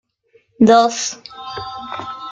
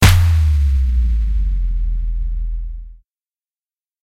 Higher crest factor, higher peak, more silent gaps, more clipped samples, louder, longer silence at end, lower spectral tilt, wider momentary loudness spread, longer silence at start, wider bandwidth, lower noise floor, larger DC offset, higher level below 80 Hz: about the same, 16 dB vs 16 dB; about the same, -2 dBFS vs 0 dBFS; neither; neither; first, -15 LUFS vs -18 LUFS; second, 0 s vs 1.15 s; about the same, -4 dB/octave vs -5 dB/octave; first, 18 LU vs 14 LU; first, 0.6 s vs 0 s; second, 9.2 kHz vs 16 kHz; second, -57 dBFS vs under -90 dBFS; neither; second, -56 dBFS vs -18 dBFS